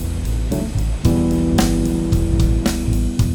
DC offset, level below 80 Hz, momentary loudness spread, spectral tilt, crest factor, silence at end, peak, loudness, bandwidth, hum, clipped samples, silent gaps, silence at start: under 0.1%; -20 dBFS; 5 LU; -6.5 dB/octave; 16 dB; 0 s; 0 dBFS; -19 LUFS; 18 kHz; none; under 0.1%; none; 0 s